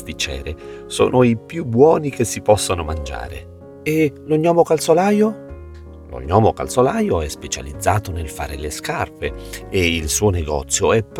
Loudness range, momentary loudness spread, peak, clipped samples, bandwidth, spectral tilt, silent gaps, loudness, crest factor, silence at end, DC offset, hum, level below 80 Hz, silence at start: 4 LU; 17 LU; 0 dBFS; under 0.1%; 17.5 kHz; -5 dB/octave; none; -18 LUFS; 18 dB; 0 s; under 0.1%; none; -36 dBFS; 0 s